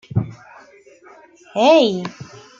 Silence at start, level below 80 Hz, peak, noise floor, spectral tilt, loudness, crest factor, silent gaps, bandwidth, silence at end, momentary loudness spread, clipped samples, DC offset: 0.15 s; -56 dBFS; -2 dBFS; -47 dBFS; -6 dB/octave; -17 LUFS; 18 dB; none; 7.6 kHz; 0.35 s; 20 LU; under 0.1%; under 0.1%